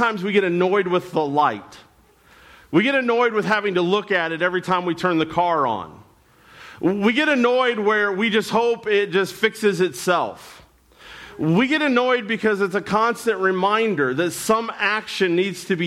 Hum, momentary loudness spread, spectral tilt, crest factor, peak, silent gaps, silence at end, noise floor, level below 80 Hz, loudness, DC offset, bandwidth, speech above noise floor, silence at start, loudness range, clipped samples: none; 4 LU; -5 dB/octave; 14 dB; -6 dBFS; none; 0 s; -53 dBFS; -60 dBFS; -20 LUFS; under 0.1%; 15.5 kHz; 34 dB; 0 s; 2 LU; under 0.1%